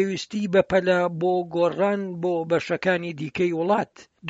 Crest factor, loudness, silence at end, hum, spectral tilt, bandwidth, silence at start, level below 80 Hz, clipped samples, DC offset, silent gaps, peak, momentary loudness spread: 18 dB; -23 LUFS; 0 s; none; -6.5 dB/octave; 8 kHz; 0 s; -60 dBFS; under 0.1%; under 0.1%; none; -6 dBFS; 6 LU